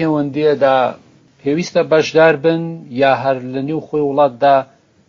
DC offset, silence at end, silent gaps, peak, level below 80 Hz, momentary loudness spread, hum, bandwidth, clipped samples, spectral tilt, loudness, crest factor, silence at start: under 0.1%; 0.45 s; none; 0 dBFS; -62 dBFS; 10 LU; none; 7.4 kHz; under 0.1%; -4.5 dB/octave; -15 LUFS; 16 dB; 0 s